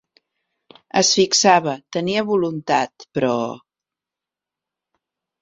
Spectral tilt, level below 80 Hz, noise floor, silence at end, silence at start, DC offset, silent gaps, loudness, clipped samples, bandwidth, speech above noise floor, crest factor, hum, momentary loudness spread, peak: -3 dB/octave; -64 dBFS; -88 dBFS; 1.85 s; 0.95 s; under 0.1%; none; -18 LUFS; under 0.1%; 7.8 kHz; 69 dB; 22 dB; none; 11 LU; 0 dBFS